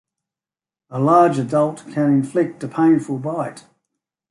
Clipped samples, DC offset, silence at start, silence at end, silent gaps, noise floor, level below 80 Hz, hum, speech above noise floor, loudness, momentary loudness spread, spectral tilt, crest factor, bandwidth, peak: under 0.1%; under 0.1%; 0.9 s; 0.7 s; none; under -90 dBFS; -66 dBFS; none; over 72 dB; -18 LUFS; 11 LU; -8 dB/octave; 18 dB; 11.5 kHz; -2 dBFS